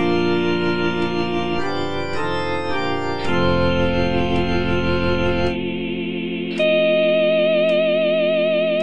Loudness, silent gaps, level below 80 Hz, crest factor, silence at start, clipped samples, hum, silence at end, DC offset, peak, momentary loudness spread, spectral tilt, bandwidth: -20 LUFS; none; -38 dBFS; 12 dB; 0 s; under 0.1%; none; 0 s; under 0.1%; -6 dBFS; 8 LU; -7 dB/octave; 9.4 kHz